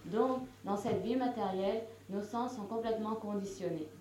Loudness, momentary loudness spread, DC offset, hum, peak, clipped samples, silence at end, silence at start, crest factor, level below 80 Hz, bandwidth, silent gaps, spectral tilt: -37 LUFS; 6 LU; under 0.1%; none; -18 dBFS; under 0.1%; 0 s; 0 s; 18 dB; -68 dBFS; 16 kHz; none; -6.5 dB/octave